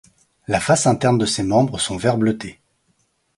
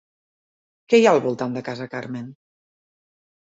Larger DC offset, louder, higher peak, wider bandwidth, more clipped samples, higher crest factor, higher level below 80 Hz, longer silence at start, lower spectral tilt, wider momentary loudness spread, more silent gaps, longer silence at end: neither; about the same, -19 LUFS vs -20 LUFS; about the same, -2 dBFS vs -2 dBFS; first, 11.5 kHz vs 8 kHz; neither; about the same, 18 dB vs 22 dB; first, -48 dBFS vs -70 dBFS; second, 0.5 s vs 0.9 s; about the same, -5 dB/octave vs -5.5 dB/octave; second, 11 LU vs 18 LU; neither; second, 0.85 s vs 1.2 s